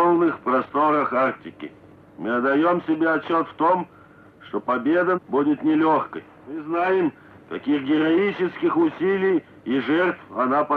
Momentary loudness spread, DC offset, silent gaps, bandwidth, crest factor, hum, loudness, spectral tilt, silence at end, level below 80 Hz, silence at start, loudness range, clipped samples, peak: 14 LU; under 0.1%; none; 4.8 kHz; 14 dB; none; -22 LUFS; -8.5 dB/octave; 0 s; -68 dBFS; 0 s; 1 LU; under 0.1%; -8 dBFS